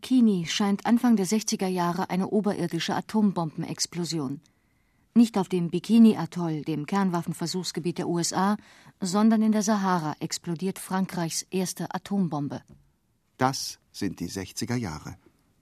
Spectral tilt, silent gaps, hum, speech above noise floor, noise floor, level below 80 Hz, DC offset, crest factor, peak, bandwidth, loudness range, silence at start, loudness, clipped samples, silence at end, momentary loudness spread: -5 dB/octave; none; none; 44 dB; -70 dBFS; -64 dBFS; under 0.1%; 20 dB; -6 dBFS; 14 kHz; 6 LU; 0 s; -26 LUFS; under 0.1%; 0.45 s; 11 LU